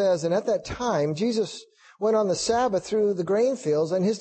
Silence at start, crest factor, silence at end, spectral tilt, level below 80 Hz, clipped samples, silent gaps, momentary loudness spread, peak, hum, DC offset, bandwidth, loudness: 0 s; 12 dB; 0 s; -5 dB/octave; -56 dBFS; under 0.1%; none; 5 LU; -12 dBFS; none; under 0.1%; 8.8 kHz; -25 LUFS